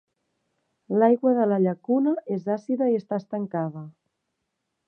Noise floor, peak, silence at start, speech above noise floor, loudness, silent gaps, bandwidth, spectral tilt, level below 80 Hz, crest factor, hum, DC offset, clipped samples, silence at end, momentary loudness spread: -79 dBFS; -6 dBFS; 0.9 s; 56 dB; -24 LUFS; none; 6.2 kHz; -10.5 dB/octave; -78 dBFS; 18 dB; none; under 0.1%; under 0.1%; 0.95 s; 10 LU